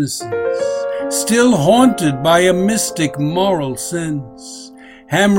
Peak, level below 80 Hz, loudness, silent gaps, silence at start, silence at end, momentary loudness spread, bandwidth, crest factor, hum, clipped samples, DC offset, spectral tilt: 0 dBFS; -48 dBFS; -15 LUFS; none; 0 s; 0 s; 13 LU; 16.5 kHz; 16 dB; none; under 0.1%; under 0.1%; -4.5 dB/octave